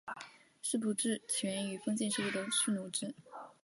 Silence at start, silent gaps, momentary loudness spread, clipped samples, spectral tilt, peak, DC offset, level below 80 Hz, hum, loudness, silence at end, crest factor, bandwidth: 0.05 s; none; 15 LU; under 0.1%; -3 dB/octave; -20 dBFS; under 0.1%; -84 dBFS; none; -35 LUFS; 0.1 s; 18 dB; 12 kHz